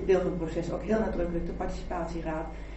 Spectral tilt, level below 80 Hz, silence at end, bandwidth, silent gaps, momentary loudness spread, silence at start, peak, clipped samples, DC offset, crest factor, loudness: -7.5 dB/octave; -38 dBFS; 0 s; 8.2 kHz; none; 8 LU; 0 s; -14 dBFS; under 0.1%; under 0.1%; 16 dB; -31 LUFS